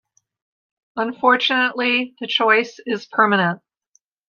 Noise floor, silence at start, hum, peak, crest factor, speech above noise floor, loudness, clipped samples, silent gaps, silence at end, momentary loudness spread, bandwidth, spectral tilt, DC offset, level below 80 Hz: -64 dBFS; 0.95 s; none; -2 dBFS; 18 dB; 45 dB; -18 LUFS; under 0.1%; none; 0.75 s; 10 LU; 7.2 kHz; -5 dB/octave; under 0.1%; -74 dBFS